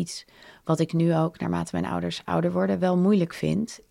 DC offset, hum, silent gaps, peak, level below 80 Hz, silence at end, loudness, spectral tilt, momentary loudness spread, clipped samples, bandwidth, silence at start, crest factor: under 0.1%; none; none; -10 dBFS; -56 dBFS; 0.15 s; -25 LUFS; -7 dB/octave; 7 LU; under 0.1%; 12 kHz; 0 s; 14 dB